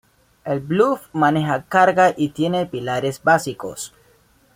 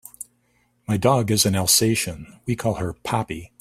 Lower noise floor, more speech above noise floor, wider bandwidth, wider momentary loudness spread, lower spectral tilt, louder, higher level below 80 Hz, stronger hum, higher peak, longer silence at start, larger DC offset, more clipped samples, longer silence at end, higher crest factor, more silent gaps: second, -56 dBFS vs -65 dBFS; second, 37 dB vs 43 dB; about the same, 16.5 kHz vs 16 kHz; second, 14 LU vs 22 LU; first, -5.5 dB/octave vs -4 dB/octave; about the same, -19 LUFS vs -21 LUFS; second, -58 dBFS vs -50 dBFS; second, none vs 60 Hz at -45 dBFS; about the same, -2 dBFS vs -4 dBFS; first, 0.45 s vs 0.2 s; neither; neither; first, 0.7 s vs 0.15 s; about the same, 18 dB vs 20 dB; neither